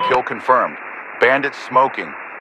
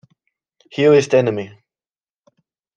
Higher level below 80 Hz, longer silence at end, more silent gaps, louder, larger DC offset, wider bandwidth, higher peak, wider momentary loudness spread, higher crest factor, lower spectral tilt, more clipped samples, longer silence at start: first, -60 dBFS vs -66 dBFS; second, 0 s vs 1.3 s; neither; about the same, -17 LUFS vs -16 LUFS; neither; first, 10.5 kHz vs 9.2 kHz; about the same, 0 dBFS vs -2 dBFS; second, 14 LU vs 18 LU; about the same, 18 dB vs 18 dB; second, -4.5 dB/octave vs -6 dB/octave; neither; second, 0 s vs 0.75 s